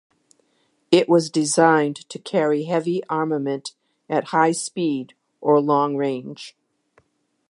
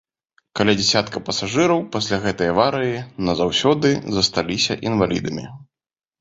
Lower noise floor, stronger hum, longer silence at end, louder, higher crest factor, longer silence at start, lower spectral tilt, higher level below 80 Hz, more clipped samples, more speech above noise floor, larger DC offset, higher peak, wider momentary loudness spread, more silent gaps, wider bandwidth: second, -66 dBFS vs under -90 dBFS; neither; first, 1 s vs 0.55 s; about the same, -21 LUFS vs -19 LUFS; about the same, 20 dB vs 18 dB; first, 0.9 s vs 0.55 s; about the same, -5 dB/octave vs -4.5 dB/octave; second, -76 dBFS vs -48 dBFS; neither; second, 46 dB vs over 70 dB; neither; about the same, -2 dBFS vs -2 dBFS; first, 15 LU vs 8 LU; neither; first, 11.5 kHz vs 8 kHz